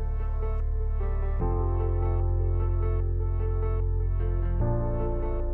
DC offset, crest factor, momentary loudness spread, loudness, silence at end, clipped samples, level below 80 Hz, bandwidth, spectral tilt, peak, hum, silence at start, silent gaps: under 0.1%; 10 dB; 3 LU; -29 LUFS; 0 s; under 0.1%; -28 dBFS; 2.8 kHz; -12.5 dB/octave; -16 dBFS; none; 0 s; none